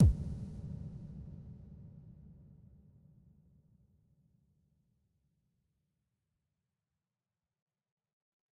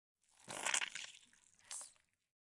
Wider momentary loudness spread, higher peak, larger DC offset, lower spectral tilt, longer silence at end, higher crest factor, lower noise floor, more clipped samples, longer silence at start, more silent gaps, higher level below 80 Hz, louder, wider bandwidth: about the same, 19 LU vs 21 LU; about the same, -16 dBFS vs -18 dBFS; neither; first, -10.5 dB/octave vs 1.5 dB/octave; first, 6.25 s vs 0.55 s; second, 24 dB vs 30 dB; first, under -90 dBFS vs -69 dBFS; neither; second, 0 s vs 0.4 s; neither; first, -48 dBFS vs -90 dBFS; about the same, -40 LUFS vs -42 LUFS; second, 4.5 kHz vs 12 kHz